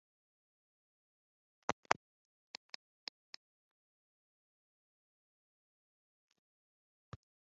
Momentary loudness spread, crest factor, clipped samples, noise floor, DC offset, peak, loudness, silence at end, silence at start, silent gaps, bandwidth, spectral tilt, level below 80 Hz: 21 LU; 42 dB; under 0.1%; under -90 dBFS; under 0.1%; -8 dBFS; -42 LUFS; 5.65 s; 1.7 s; 1.72-1.83 s; 6.8 kHz; -1 dB/octave; -78 dBFS